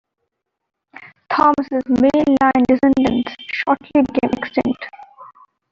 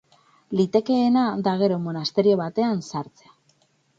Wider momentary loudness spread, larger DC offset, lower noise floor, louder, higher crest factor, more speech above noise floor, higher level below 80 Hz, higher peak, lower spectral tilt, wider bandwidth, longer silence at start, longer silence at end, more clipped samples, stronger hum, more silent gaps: about the same, 9 LU vs 10 LU; neither; first, -76 dBFS vs -64 dBFS; first, -17 LUFS vs -22 LUFS; about the same, 16 dB vs 18 dB; first, 60 dB vs 42 dB; first, -48 dBFS vs -66 dBFS; first, -2 dBFS vs -6 dBFS; about the same, -6.5 dB/octave vs -7 dB/octave; about the same, 7.2 kHz vs 7.8 kHz; first, 1.3 s vs 0.5 s; second, 0.45 s vs 0.95 s; neither; neither; neither